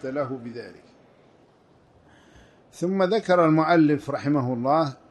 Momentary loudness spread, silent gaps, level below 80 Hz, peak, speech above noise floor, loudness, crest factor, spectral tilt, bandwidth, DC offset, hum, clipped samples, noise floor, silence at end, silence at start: 17 LU; none; -66 dBFS; -8 dBFS; 35 dB; -22 LUFS; 16 dB; -7.5 dB/octave; 11 kHz; under 0.1%; none; under 0.1%; -58 dBFS; 0.15 s; 0.05 s